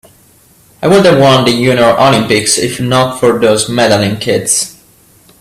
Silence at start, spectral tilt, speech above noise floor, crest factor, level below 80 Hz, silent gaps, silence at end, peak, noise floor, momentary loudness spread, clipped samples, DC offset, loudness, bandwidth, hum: 0.8 s; -4 dB/octave; 36 dB; 10 dB; -44 dBFS; none; 0.7 s; 0 dBFS; -45 dBFS; 6 LU; under 0.1%; under 0.1%; -9 LUFS; 16 kHz; none